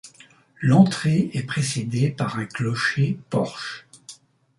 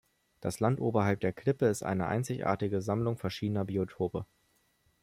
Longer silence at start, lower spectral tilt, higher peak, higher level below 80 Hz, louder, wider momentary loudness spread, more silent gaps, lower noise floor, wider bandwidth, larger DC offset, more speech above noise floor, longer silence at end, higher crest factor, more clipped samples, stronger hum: second, 0.05 s vs 0.4 s; about the same, -6 dB/octave vs -7 dB/octave; first, -2 dBFS vs -14 dBFS; about the same, -60 dBFS vs -64 dBFS; first, -22 LUFS vs -32 LUFS; first, 17 LU vs 6 LU; neither; second, -52 dBFS vs -72 dBFS; second, 11.5 kHz vs 16 kHz; neither; second, 31 dB vs 41 dB; second, 0.45 s vs 0.8 s; about the same, 20 dB vs 18 dB; neither; neither